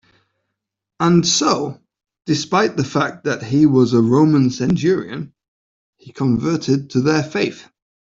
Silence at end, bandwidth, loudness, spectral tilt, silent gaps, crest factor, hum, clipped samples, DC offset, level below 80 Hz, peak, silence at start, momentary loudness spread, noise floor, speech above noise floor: 0.4 s; 7.8 kHz; -17 LUFS; -5.5 dB/octave; 5.48-5.93 s; 14 dB; none; under 0.1%; under 0.1%; -54 dBFS; -4 dBFS; 1 s; 10 LU; -80 dBFS; 63 dB